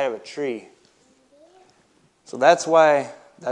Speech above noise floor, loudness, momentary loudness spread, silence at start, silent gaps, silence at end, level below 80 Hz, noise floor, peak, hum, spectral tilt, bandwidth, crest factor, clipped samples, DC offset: 41 dB; -19 LUFS; 20 LU; 0 s; none; 0 s; -78 dBFS; -60 dBFS; -2 dBFS; none; -3.5 dB/octave; 10.5 kHz; 20 dB; under 0.1%; under 0.1%